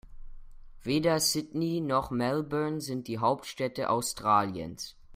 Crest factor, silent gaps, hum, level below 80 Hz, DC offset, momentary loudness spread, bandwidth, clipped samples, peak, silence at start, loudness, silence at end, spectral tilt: 20 dB; none; none; -52 dBFS; under 0.1%; 9 LU; 16 kHz; under 0.1%; -10 dBFS; 0.05 s; -29 LUFS; 0 s; -4.5 dB/octave